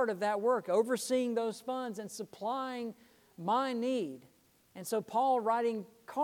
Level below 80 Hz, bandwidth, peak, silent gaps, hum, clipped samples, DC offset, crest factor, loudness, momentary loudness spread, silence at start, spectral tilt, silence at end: -82 dBFS; 18.5 kHz; -16 dBFS; none; none; under 0.1%; under 0.1%; 16 dB; -34 LUFS; 12 LU; 0 s; -4.5 dB/octave; 0 s